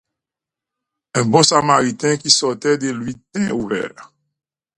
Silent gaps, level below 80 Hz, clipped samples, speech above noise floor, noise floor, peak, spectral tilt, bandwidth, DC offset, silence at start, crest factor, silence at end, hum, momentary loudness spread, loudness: none; -58 dBFS; under 0.1%; 70 dB; -87 dBFS; 0 dBFS; -3.5 dB/octave; 11.5 kHz; under 0.1%; 1.15 s; 20 dB; 0.75 s; none; 12 LU; -16 LUFS